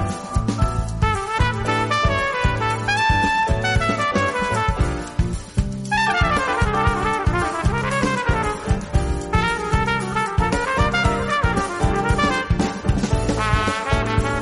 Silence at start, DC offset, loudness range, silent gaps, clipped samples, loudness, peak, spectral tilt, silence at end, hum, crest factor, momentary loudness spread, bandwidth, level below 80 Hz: 0 s; under 0.1%; 1 LU; none; under 0.1%; -20 LUFS; -6 dBFS; -5.5 dB/octave; 0 s; none; 14 dB; 4 LU; 11.5 kHz; -26 dBFS